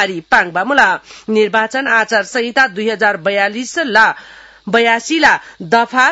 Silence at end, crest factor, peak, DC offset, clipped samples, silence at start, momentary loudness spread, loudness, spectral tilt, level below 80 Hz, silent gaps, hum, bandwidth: 0 s; 14 dB; 0 dBFS; under 0.1%; 0.1%; 0 s; 6 LU; -13 LUFS; -3 dB/octave; -52 dBFS; none; none; 11.5 kHz